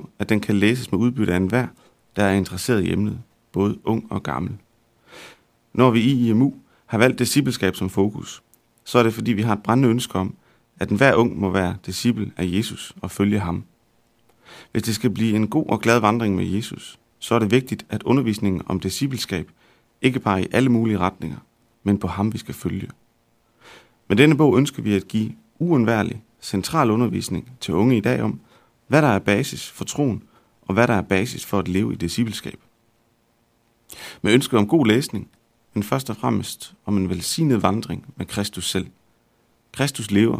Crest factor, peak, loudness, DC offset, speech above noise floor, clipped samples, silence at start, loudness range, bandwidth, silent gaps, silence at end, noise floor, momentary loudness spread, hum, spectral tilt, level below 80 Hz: 20 dB; 0 dBFS; -21 LUFS; under 0.1%; 43 dB; under 0.1%; 0 s; 4 LU; 16 kHz; none; 0 s; -64 dBFS; 14 LU; none; -6 dB/octave; -52 dBFS